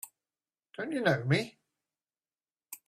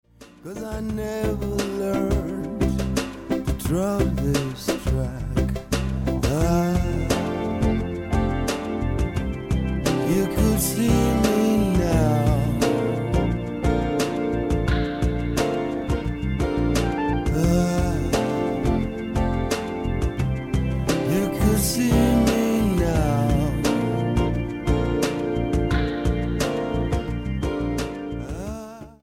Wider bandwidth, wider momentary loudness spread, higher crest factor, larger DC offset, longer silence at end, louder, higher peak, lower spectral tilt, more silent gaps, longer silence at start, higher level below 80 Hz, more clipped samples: about the same, 15.5 kHz vs 17 kHz; first, 20 LU vs 7 LU; first, 24 dB vs 16 dB; neither; about the same, 0.1 s vs 0.1 s; second, -31 LUFS vs -23 LUFS; second, -12 dBFS vs -6 dBFS; about the same, -5.5 dB/octave vs -6 dB/octave; first, 2.52-2.56 s vs none; second, 0.05 s vs 0.2 s; second, -72 dBFS vs -30 dBFS; neither